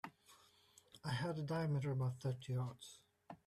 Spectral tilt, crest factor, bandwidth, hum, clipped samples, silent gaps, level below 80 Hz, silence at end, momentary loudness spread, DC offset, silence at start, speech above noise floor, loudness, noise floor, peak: -6.5 dB/octave; 14 dB; 13.5 kHz; none; under 0.1%; none; -74 dBFS; 0.1 s; 19 LU; under 0.1%; 0.05 s; 29 dB; -42 LUFS; -70 dBFS; -30 dBFS